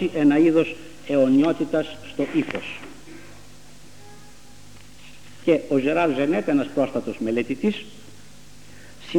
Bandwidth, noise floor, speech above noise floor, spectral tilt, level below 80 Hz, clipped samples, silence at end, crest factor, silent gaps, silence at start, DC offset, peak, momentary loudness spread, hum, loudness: 12 kHz; -48 dBFS; 27 dB; -6.5 dB/octave; -58 dBFS; under 0.1%; 0 s; 18 dB; none; 0 s; 0.8%; -6 dBFS; 20 LU; 50 Hz at -55 dBFS; -22 LUFS